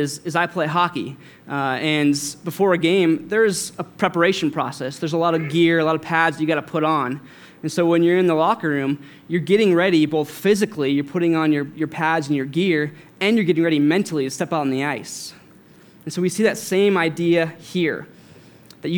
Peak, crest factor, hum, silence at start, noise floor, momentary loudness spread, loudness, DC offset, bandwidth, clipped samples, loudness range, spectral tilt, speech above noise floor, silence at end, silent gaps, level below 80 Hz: 0 dBFS; 20 dB; none; 0 s; -48 dBFS; 10 LU; -20 LUFS; under 0.1%; 19 kHz; under 0.1%; 3 LU; -5.5 dB/octave; 28 dB; 0 s; none; -70 dBFS